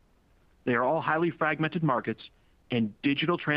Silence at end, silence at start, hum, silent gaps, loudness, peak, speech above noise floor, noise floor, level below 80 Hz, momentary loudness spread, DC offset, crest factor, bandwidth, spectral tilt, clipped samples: 0 s; 0.65 s; none; none; -28 LUFS; -10 dBFS; 36 dB; -63 dBFS; -64 dBFS; 8 LU; under 0.1%; 18 dB; 5.4 kHz; -9 dB/octave; under 0.1%